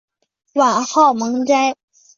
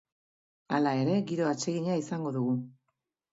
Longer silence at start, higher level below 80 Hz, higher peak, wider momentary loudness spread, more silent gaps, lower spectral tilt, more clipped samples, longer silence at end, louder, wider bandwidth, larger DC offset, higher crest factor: second, 0.55 s vs 0.7 s; first, -68 dBFS vs -76 dBFS; first, -2 dBFS vs -14 dBFS; first, 9 LU vs 6 LU; neither; second, -3 dB/octave vs -6 dB/octave; neither; second, 0.45 s vs 0.6 s; first, -16 LUFS vs -30 LUFS; about the same, 7.6 kHz vs 7.8 kHz; neither; about the same, 14 dB vs 18 dB